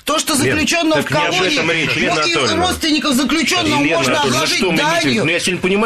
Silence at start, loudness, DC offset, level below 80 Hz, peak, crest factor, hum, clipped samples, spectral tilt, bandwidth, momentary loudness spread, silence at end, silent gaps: 0.05 s; -14 LUFS; 0.1%; -42 dBFS; -4 dBFS; 10 dB; none; under 0.1%; -3 dB/octave; 14 kHz; 1 LU; 0 s; none